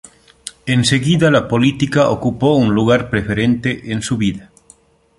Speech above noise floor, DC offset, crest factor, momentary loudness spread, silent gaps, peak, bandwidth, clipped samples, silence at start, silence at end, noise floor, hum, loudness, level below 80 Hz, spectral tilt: 35 dB; under 0.1%; 16 dB; 9 LU; none; 0 dBFS; 11.5 kHz; under 0.1%; 0.45 s; 0.75 s; -50 dBFS; none; -15 LUFS; -42 dBFS; -5.5 dB/octave